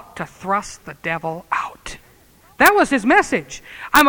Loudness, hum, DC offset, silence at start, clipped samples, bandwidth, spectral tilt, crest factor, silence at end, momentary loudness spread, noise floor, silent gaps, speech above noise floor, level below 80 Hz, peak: -18 LUFS; none; under 0.1%; 0.15 s; under 0.1%; over 20 kHz; -3.5 dB/octave; 20 dB; 0 s; 20 LU; -51 dBFS; none; 33 dB; -46 dBFS; 0 dBFS